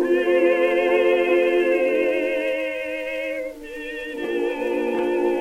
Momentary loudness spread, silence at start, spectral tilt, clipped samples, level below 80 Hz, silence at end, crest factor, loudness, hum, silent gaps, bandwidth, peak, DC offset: 12 LU; 0 s; -4.5 dB/octave; under 0.1%; -54 dBFS; 0 s; 14 dB; -21 LUFS; none; none; 13.5 kHz; -8 dBFS; under 0.1%